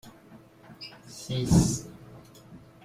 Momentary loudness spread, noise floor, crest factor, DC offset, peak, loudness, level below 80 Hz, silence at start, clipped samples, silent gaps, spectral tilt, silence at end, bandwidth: 27 LU; -53 dBFS; 24 dB; under 0.1%; -8 dBFS; -26 LUFS; -44 dBFS; 0.05 s; under 0.1%; none; -5.5 dB/octave; 0.25 s; 15.5 kHz